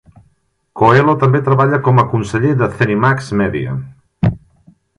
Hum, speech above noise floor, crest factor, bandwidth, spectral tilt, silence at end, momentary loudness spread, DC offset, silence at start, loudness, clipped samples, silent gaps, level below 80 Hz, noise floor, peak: none; 46 dB; 14 dB; 10.5 kHz; -8 dB/octave; 0.6 s; 9 LU; under 0.1%; 0.75 s; -14 LUFS; under 0.1%; none; -40 dBFS; -59 dBFS; 0 dBFS